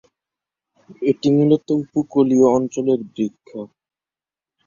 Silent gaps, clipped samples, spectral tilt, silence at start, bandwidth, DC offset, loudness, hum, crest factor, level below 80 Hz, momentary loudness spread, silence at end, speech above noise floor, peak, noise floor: none; under 0.1%; -7.5 dB/octave; 1 s; 7.4 kHz; under 0.1%; -18 LUFS; none; 16 dB; -62 dBFS; 20 LU; 1 s; over 72 dB; -4 dBFS; under -90 dBFS